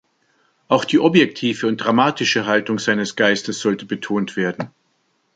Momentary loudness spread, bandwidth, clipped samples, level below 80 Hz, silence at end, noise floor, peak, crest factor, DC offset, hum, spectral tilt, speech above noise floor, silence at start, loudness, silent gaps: 8 LU; 9.2 kHz; under 0.1%; -64 dBFS; 0.7 s; -66 dBFS; 0 dBFS; 18 dB; under 0.1%; none; -4.5 dB/octave; 47 dB; 0.7 s; -18 LUFS; none